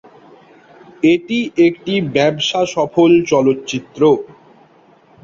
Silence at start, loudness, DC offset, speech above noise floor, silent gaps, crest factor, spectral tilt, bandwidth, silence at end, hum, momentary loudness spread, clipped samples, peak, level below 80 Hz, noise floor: 1.05 s; -15 LUFS; under 0.1%; 35 dB; none; 14 dB; -5.5 dB/octave; 7.6 kHz; 1 s; none; 8 LU; under 0.1%; -2 dBFS; -56 dBFS; -49 dBFS